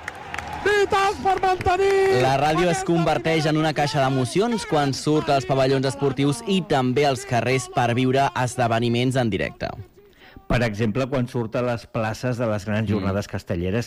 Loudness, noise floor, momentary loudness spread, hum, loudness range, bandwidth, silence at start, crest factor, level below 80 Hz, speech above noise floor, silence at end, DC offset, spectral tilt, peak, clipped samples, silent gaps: -22 LUFS; -47 dBFS; 7 LU; none; 5 LU; 15.5 kHz; 0 s; 12 dB; -44 dBFS; 26 dB; 0 s; under 0.1%; -5.5 dB/octave; -10 dBFS; under 0.1%; none